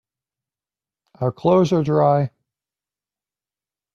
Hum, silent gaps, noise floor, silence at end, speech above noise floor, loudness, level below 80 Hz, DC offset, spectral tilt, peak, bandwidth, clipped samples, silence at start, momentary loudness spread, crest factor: 50 Hz at -45 dBFS; none; under -90 dBFS; 1.65 s; over 73 dB; -19 LUFS; -60 dBFS; under 0.1%; -8.5 dB/octave; -4 dBFS; 7.4 kHz; under 0.1%; 1.2 s; 10 LU; 18 dB